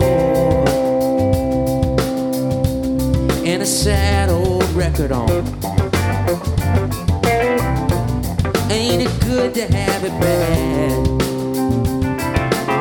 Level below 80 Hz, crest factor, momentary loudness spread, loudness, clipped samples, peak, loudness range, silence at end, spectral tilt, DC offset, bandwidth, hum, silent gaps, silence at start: -28 dBFS; 16 dB; 4 LU; -17 LUFS; under 0.1%; 0 dBFS; 1 LU; 0 s; -6 dB/octave; under 0.1%; 18 kHz; none; none; 0 s